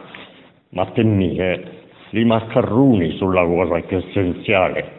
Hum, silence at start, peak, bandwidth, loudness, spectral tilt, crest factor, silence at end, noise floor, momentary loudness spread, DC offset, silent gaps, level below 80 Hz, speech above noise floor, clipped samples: none; 0 s; -2 dBFS; 4.1 kHz; -18 LUFS; -9.5 dB/octave; 18 dB; 0 s; -46 dBFS; 12 LU; under 0.1%; none; -46 dBFS; 29 dB; under 0.1%